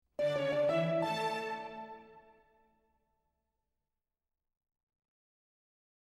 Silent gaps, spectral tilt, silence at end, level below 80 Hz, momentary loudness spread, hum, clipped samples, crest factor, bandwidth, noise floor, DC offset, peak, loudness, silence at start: none; -6 dB/octave; 3.85 s; -76 dBFS; 17 LU; none; under 0.1%; 20 dB; 13 kHz; under -90 dBFS; under 0.1%; -20 dBFS; -34 LUFS; 0.2 s